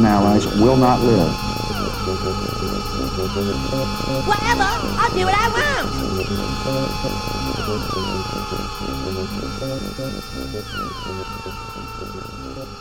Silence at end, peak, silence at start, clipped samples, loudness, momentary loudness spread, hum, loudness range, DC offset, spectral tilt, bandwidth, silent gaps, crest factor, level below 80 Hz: 0 s; -2 dBFS; 0 s; under 0.1%; -21 LUFS; 14 LU; none; 8 LU; 0.8%; -5.5 dB/octave; 17.5 kHz; none; 18 dB; -32 dBFS